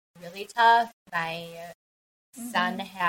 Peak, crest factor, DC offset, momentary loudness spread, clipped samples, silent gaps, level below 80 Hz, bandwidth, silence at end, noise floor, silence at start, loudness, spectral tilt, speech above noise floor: -8 dBFS; 20 dB; under 0.1%; 22 LU; under 0.1%; 0.93-1.06 s, 1.74-2.33 s; -74 dBFS; 16.5 kHz; 0 s; under -90 dBFS; 0.2 s; -25 LUFS; -3.5 dB/octave; over 64 dB